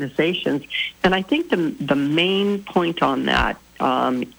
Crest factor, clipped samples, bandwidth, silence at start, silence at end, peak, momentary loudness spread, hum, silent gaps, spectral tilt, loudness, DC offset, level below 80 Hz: 14 dB; under 0.1%; over 20 kHz; 0 s; 0.1 s; -6 dBFS; 5 LU; none; none; -6 dB/octave; -20 LUFS; under 0.1%; -42 dBFS